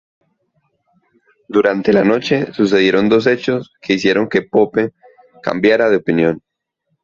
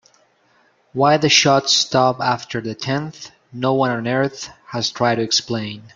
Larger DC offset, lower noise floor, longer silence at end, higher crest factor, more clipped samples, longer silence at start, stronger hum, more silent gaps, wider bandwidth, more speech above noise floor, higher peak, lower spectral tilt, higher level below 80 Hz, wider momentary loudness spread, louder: neither; first, -71 dBFS vs -58 dBFS; first, 0.65 s vs 0.05 s; about the same, 16 dB vs 18 dB; neither; first, 1.5 s vs 0.95 s; neither; neither; second, 7.4 kHz vs 11 kHz; first, 57 dB vs 40 dB; about the same, 0 dBFS vs 0 dBFS; first, -6 dB/octave vs -3.5 dB/octave; first, -54 dBFS vs -60 dBFS; second, 8 LU vs 16 LU; first, -15 LUFS vs -18 LUFS